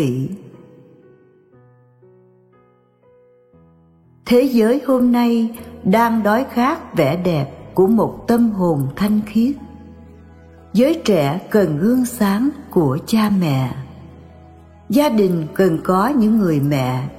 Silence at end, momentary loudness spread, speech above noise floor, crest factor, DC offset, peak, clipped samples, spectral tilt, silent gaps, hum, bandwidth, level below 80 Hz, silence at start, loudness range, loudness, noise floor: 0 s; 8 LU; 38 dB; 16 dB; under 0.1%; -2 dBFS; under 0.1%; -7 dB/octave; none; none; 16 kHz; -48 dBFS; 0 s; 3 LU; -17 LUFS; -54 dBFS